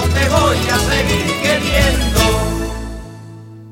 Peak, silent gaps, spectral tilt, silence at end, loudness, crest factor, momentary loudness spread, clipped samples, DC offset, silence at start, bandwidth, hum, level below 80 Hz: -2 dBFS; none; -4 dB/octave; 0 s; -15 LUFS; 14 dB; 20 LU; under 0.1%; under 0.1%; 0 s; 17 kHz; none; -22 dBFS